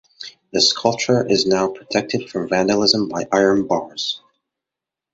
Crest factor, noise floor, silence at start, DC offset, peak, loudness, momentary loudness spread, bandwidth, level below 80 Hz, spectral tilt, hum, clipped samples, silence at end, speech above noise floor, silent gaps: 20 dB; -86 dBFS; 0.2 s; under 0.1%; 0 dBFS; -18 LUFS; 10 LU; 8 kHz; -56 dBFS; -3.5 dB/octave; none; under 0.1%; 0.95 s; 68 dB; none